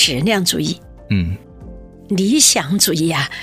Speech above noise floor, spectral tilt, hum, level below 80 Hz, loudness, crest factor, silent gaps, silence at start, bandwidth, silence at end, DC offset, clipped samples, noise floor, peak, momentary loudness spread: 20 dB; -3 dB/octave; none; -40 dBFS; -15 LUFS; 18 dB; none; 0 s; 16 kHz; 0 s; under 0.1%; under 0.1%; -36 dBFS; 0 dBFS; 13 LU